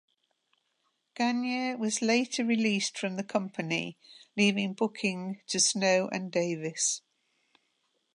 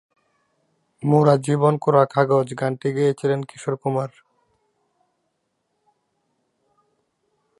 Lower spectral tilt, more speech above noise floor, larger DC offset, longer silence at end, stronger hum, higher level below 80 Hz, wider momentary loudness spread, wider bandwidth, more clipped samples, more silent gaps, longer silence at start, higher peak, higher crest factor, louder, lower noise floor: second, -3 dB/octave vs -7.5 dB/octave; second, 47 dB vs 54 dB; neither; second, 1.2 s vs 3.5 s; neither; second, -80 dBFS vs -70 dBFS; second, 7 LU vs 10 LU; about the same, 11.5 kHz vs 11.5 kHz; neither; neither; about the same, 1.15 s vs 1.05 s; second, -12 dBFS vs -2 dBFS; about the same, 18 dB vs 20 dB; second, -29 LUFS vs -20 LUFS; first, -77 dBFS vs -73 dBFS